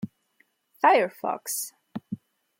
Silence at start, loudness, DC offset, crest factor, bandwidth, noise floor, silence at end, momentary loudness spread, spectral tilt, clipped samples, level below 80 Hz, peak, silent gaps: 0 s; -25 LUFS; under 0.1%; 20 dB; 16.5 kHz; -68 dBFS; 0.45 s; 20 LU; -3.5 dB/octave; under 0.1%; -78 dBFS; -8 dBFS; none